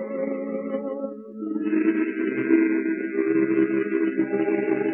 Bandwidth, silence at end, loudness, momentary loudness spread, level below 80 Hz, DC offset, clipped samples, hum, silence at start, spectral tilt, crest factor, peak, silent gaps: 3.1 kHz; 0 s; -24 LUFS; 9 LU; -76 dBFS; under 0.1%; under 0.1%; none; 0 s; -11 dB/octave; 16 dB; -8 dBFS; none